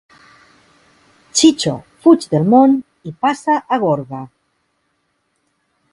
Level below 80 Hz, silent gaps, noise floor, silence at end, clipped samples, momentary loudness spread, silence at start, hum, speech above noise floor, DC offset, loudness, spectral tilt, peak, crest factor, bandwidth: -58 dBFS; none; -67 dBFS; 1.65 s; under 0.1%; 17 LU; 1.35 s; none; 53 dB; under 0.1%; -15 LUFS; -5 dB/octave; 0 dBFS; 18 dB; 11.5 kHz